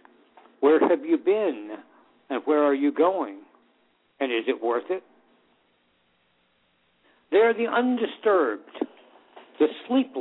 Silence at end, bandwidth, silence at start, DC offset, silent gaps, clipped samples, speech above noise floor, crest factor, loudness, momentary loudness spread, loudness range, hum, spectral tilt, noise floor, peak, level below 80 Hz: 0 s; 4.1 kHz; 0.6 s; under 0.1%; none; under 0.1%; 44 dB; 18 dB; -24 LUFS; 14 LU; 8 LU; none; -8.5 dB/octave; -67 dBFS; -8 dBFS; -76 dBFS